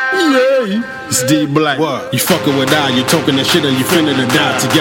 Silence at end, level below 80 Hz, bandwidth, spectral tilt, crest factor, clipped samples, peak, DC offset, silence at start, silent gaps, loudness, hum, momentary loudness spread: 0 s; -50 dBFS; 17 kHz; -4 dB/octave; 12 dB; under 0.1%; 0 dBFS; under 0.1%; 0 s; none; -12 LUFS; none; 4 LU